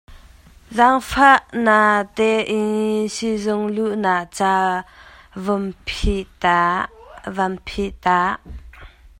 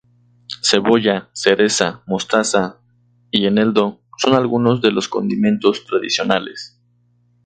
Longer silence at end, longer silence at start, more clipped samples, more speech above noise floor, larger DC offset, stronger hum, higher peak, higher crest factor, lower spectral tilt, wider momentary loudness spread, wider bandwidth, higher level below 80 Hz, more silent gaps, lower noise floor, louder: second, 0.1 s vs 0.8 s; second, 0.1 s vs 0.5 s; neither; second, 28 dB vs 42 dB; neither; second, none vs 60 Hz at -40 dBFS; about the same, 0 dBFS vs 0 dBFS; about the same, 20 dB vs 18 dB; about the same, -5 dB/octave vs -4 dB/octave; first, 13 LU vs 8 LU; first, 16 kHz vs 9.4 kHz; first, -38 dBFS vs -58 dBFS; neither; second, -46 dBFS vs -59 dBFS; about the same, -19 LUFS vs -17 LUFS